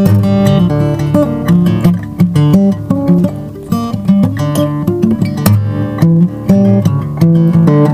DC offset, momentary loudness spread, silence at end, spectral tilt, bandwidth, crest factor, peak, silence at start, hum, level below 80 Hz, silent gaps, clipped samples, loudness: under 0.1%; 6 LU; 0 s; -8.5 dB/octave; 15.5 kHz; 10 dB; 0 dBFS; 0 s; none; -36 dBFS; none; 0.7%; -11 LUFS